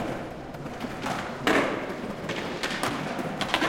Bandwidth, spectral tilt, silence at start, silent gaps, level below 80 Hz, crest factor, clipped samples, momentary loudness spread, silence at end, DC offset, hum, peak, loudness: 16.5 kHz; -4 dB/octave; 0 s; none; -54 dBFS; 24 dB; under 0.1%; 11 LU; 0 s; under 0.1%; none; -4 dBFS; -30 LUFS